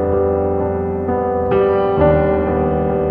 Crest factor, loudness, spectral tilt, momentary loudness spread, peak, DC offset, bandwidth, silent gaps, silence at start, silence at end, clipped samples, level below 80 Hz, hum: 14 dB; -16 LUFS; -11 dB/octave; 5 LU; -2 dBFS; under 0.1%; 4.3 kHz; none; 0 s; 0 s; under 0.1%; -32 dBFS; none